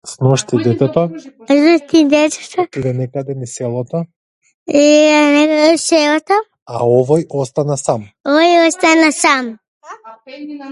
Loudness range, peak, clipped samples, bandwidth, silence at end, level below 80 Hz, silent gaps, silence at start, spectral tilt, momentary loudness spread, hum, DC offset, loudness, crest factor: 3 LU; 0 dBFS; under 0.1%; 11.5 kHz; 0 s; -56 dBFS; 4.16-4.41 s, 4.54-4.66 s, 6.62-6.66 s, 8.20-8.24 s, 9.68-9.81 s; 0.05 s; -5 dB/octave; 13 LU; none; under 0.1%; -13 LUFS; 14 dB